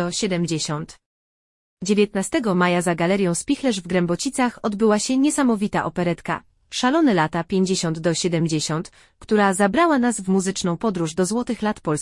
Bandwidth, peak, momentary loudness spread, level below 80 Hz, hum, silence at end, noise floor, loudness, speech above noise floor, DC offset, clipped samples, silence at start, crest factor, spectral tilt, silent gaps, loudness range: 12 kHz; -6 dBFS; 7 LU; -54 dBFS; none; 0 s; under -90 dBFS; -21 LUFS; over 69 dB; under 0.1%; under 0.1%; 0 s; 16 dB; -5 dB/octave; 1.06-1.77 s; 2 LU